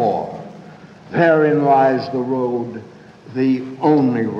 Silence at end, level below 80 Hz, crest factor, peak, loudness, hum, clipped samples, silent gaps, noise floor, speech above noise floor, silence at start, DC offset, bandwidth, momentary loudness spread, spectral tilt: 0 s; -64 dBFS; 16 dB; -2 dBFS; -17 LUFS; none; under 0.1%; none; -40 dBFS; 24 dB; 0 s; under 0.1%; 7 kHz; 16 LU; -8.5 dB/octave